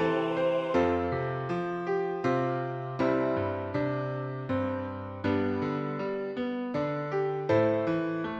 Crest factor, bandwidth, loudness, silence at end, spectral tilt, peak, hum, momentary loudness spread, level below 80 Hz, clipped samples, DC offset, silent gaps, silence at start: 16 dB; 7.8 kHz; -30 LUFS; 0 s; -8 dB/octave; -14 dBFS; none; 6 LU; -60 dBFS; under 0.1%; under 0.1%; none; 0 s